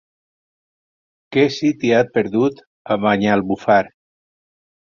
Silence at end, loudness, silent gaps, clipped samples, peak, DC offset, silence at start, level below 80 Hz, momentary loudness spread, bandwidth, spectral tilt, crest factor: 1.1 s; -18 LUFS; 2.67-2.85 s; under 0.1%; -2 dBFS; under 0.1%; 1.3 s; -56 dBFS; 6 LU; 7.2 kHz; -6.5 dB/octave; 18 dB